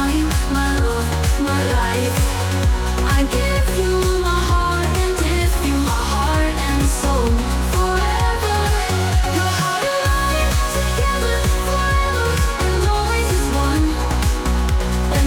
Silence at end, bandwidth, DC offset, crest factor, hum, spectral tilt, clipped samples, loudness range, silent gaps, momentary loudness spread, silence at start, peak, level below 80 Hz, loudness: 0 s; 19 kHz; under 0.1%; 12 dB; none; -5 dB/octave; under 0.1%; 0 LU; none; 2 LU; 0 s; -6 dBFS; -20 dBFS; -18 LUFS